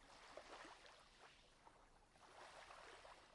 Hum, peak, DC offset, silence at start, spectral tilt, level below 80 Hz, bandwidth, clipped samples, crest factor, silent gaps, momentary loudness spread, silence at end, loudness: none; -44 dBFS; under 0.1%; 0 s; -2 dB/octave; -78 dBFS; 11 kHz; under 0.1%; 20 dB; none; 10 LU; 0 s; -63 LUFS